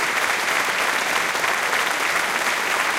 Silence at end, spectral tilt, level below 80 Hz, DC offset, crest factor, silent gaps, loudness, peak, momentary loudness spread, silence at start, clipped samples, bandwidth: 0 s; 0 dB/octave; -60 dBFS; under 0.1%; 16 dB; none; -20 LUFS; -6 dBFS; 1 LU; 0 s; under 0.1%; 17 kHz